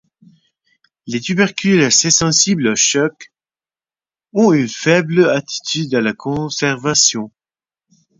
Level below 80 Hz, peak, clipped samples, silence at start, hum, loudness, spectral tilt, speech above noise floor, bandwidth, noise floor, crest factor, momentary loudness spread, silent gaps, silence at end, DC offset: -54 dBFS; 0 dBFS; under 0.1%; 1.05 s; none; -14 LUFS; -3 dB/octave; over 75 dB; 7.8 kHz; under -90 dBFS; 18 dB; 11 LU; none; 0.9 s; under 0.1%